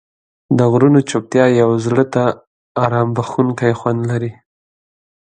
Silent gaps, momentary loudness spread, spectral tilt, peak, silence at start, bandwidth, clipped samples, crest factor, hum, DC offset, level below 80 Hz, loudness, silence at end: 2.47-2.75 s; 9 LU; -7.5 dB/octave; 0 dBFS; 0.5 s; 9.4 kHz; under 0.1%; 16 dB; none; under 0.1%; -56 dBFS; -15 LUFS; 1 s